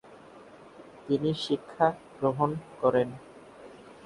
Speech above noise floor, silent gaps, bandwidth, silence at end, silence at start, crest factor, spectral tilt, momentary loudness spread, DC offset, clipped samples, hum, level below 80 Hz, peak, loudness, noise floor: 23 dB; none; 11.5 kHz; 0.1 s; 0.1 s; 22 dB; -7 dB/octave; 24 LU; under 0.1%; under 0.1%; none; -66 dBFS; -8 dBFS; -29 LUFS; -51 dBFS